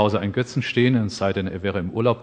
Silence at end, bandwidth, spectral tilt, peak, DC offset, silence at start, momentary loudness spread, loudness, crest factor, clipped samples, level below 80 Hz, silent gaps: 0 s; 9.6 kHz; -6.5 dB/octave; -4 dBFS; under 0.1%; 0 s; 6 LU; -22 LUFS; 18 dB; under 0.1%; -52 dBFS; none